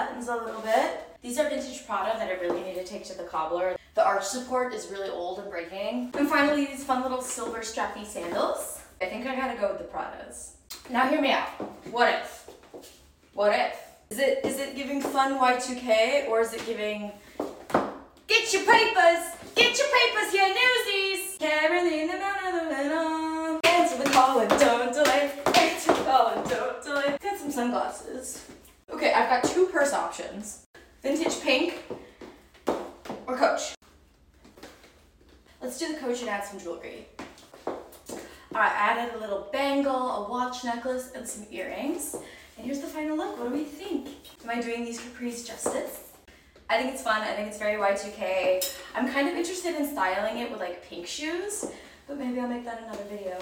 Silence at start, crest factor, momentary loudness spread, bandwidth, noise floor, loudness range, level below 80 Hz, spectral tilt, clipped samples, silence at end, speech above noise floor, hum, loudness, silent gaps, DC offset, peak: 0 s; 20 dB; 17 LU; 17 kHz; -58 dBFS; 11 LU; -60 dBFS; -2.5 dB/octave; under 0.1%; 0 s; 31 dB; none; -27 LUFS; 30.66-30.74 s, 33.77-33.81 s; under 0.1%; -6 dBFS